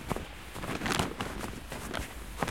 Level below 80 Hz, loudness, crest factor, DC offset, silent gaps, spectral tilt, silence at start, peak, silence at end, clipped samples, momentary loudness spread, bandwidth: -46 dBFS; -36 LUFS; 26 dB; 0.2%; none; -4 dB/octave; 0 s; -10 dBFS; 0 s; under 0.1%; 9 LU; 17 kHz